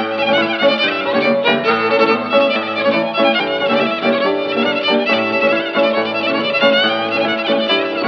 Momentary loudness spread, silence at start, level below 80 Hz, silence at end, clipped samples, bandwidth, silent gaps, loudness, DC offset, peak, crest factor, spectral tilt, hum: 3 LU; 0 s; -68 dBFS; 0 s; under 0.1%; 6.4 kHz; none; -15 LUFS; under 0.1%; -2 dBFS; 14 dB; -5.5 dB/octave; none